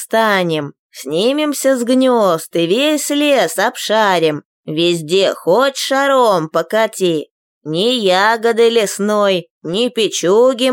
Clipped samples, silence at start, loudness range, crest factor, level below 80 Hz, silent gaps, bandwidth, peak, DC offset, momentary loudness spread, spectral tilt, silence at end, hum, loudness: under 0.1%; 0 s; 1 LU; 12 dB; -70 dBFS; 0.79-0.90 s, 4.45-4.63 s, 7.31-7.61 s, 9.50-9.61 s; 17 kHz; -2 dBFS; under 0.1%; 8 LU; -3.5 dB/octave; 0 s; none; -14 LUFS